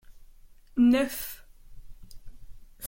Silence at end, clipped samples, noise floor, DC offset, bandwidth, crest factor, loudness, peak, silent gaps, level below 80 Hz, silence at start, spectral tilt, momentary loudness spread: 0 s; under 0.1%; -51 dBFS; under 0.1%; 17 kHz; 16 dB; -26 LUFS; -14 dBFS; none; -50 dBFS; 0.1 s; -4.5 dB/octave; 18 LU